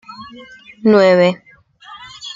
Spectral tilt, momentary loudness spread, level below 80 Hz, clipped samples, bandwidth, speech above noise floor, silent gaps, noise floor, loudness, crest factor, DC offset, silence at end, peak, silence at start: -6.5 dB/octave; 25 LU; -60 dBFS; under 0.1%; 7.6 kHz; 26 dB; none; -40 dBFS; -13 LUFS; 16 dB; under 0.1%; 0.05 s; 0 dBFS; 0.1 s